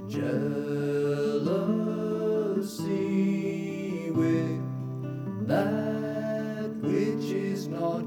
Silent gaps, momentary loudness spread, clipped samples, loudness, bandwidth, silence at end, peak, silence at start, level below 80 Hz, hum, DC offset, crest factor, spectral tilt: none; 6 LU; under 0.1%; -29 LUFS; 18 kHz; 0 s; -14 dBFS; 0 s; -72 dBFS; none; under 0.1%; 14 dB; -7.5 dB/octave